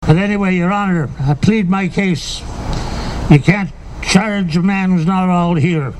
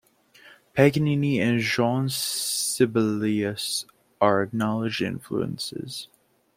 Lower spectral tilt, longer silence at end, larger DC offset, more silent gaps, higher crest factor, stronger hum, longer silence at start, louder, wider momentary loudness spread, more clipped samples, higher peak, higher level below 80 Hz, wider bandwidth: first, -6.5 dB/octave vs -4.5 dB/octave; second, 0 s vs 0.5 s; neither; neither; second, 14 dB vs 22 dB; neither; second, 0 s vs 0.45 s; first, -15 LUFS vs -24 LUFS; about the same, 11 LU vs 11 LU; neither; first, 0 dBFS vs -4 dBFS; first, -30 dBFS vs -62 dBFS; second, 11.5 kHz vs 16.5 kHz